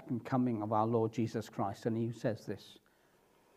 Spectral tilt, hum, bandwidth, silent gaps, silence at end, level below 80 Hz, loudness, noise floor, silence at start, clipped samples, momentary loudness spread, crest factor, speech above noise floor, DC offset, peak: -8 dB/octave; none; 14 kHz; none; 0.8 s; -78 dBFS; -36 LUFS; -69 dBFS; 0 s; under 0.1%; 9 LU; 18 dB; 34 dB; under 0.1%; -18 dBFS